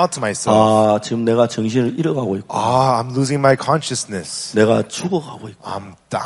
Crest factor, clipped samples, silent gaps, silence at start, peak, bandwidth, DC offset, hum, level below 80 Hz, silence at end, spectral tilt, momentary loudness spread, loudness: 16 dB; under 0.1%; none; 0 s; 0 dBFS; 11.5 kHz; under 0.1%; none; -56 dBFS; 0 s; -5.5 dB/octave; 13 LU; -17 LUFS